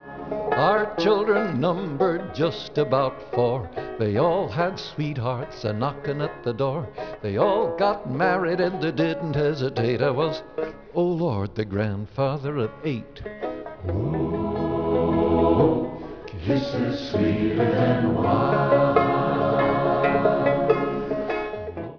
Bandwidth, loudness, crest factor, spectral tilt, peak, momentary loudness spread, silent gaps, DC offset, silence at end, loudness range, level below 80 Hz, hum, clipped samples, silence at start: 5.4 kHz; -24 LUFS; 20 dB; -8 dB/octave; -4 dBFS; 10 LU; none; 0.2%; 0 s; 6 LU; -48 dBFS; none; under 0.1%; 0 s